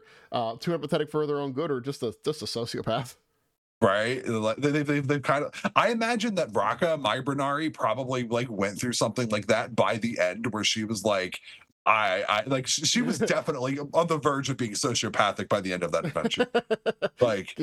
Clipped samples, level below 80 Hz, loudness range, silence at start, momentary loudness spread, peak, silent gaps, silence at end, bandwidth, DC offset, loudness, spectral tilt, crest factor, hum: under 0.1%; -66 dBFS; 4 LU; 0.3 s; 6 LU; -6 dBFS; 3.58-3.81 s, 11.72-11.85 s; 0 s; 14.5 kHz; under 0.1%; -27 LUFS; -4 dB/octave; 22 dB; none